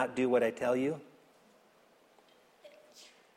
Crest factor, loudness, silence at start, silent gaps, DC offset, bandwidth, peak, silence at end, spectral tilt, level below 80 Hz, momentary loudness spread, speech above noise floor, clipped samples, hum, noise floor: 18 dB; -32 LUFS; 0 s; none; under 0.1%; 14.5 kHz; -16 dBFS; 0.3 s; -6 dB/octave; -76 dBFS; 26 LU; 34 dB; under 0.1%; none; -65 dBFS